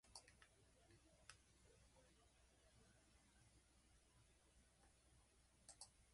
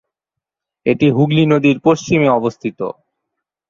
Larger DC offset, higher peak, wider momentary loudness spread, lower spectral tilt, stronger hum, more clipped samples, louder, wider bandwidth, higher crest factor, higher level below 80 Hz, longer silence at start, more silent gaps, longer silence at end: neither; second, -40 dBFS vs 0 dBFS; second, 5 LU vs 11 LU; second, -2 dB/octave vs -7 dB/octave; neither; neither; second, -66 LUFS vs -15 LUFS; first, 11.5 kHz vs 7.4 kHz; first, 32 dB vs 16 dB; second, -80 dBFS vs -56 dBFS; second, 0.05 s vs 0.85 s; neither; second, 0 s vs 0.8 s